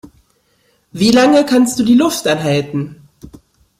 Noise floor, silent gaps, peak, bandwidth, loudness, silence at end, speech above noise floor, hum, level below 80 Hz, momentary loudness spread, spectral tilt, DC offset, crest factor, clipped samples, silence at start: -58 dBFS; none; 0 dBFS; 15.5 kHz; -13 LUFS; 0.55 s; 46 dB; none; -50 dBFS; 13 LU; -5 dB/octave; under 0.1%; 14 dB; under 0.1%; 0.05 s